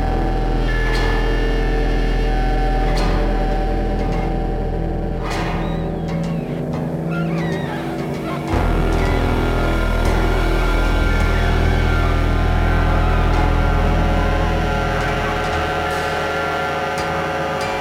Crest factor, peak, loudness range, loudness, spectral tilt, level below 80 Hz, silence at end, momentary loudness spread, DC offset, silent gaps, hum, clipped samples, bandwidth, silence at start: 12 dB; -4 dBFS; 4 LU; -20 LUFS; -6.5 dB/octave; -20 dBFS; 0 s; 5 LU; under 0.1%; none; none; under 0.1%; 12 kHz; 0 s